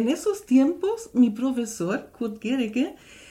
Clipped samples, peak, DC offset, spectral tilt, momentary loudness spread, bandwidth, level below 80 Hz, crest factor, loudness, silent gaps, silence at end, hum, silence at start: under 0.1%; -8 dBFS; under 0.1%; -5 dB/octave; 9 LU; 15 kHz; -62 dBFS; 16 dB; -25 LUFS; none; 0.15 s; none; 0 s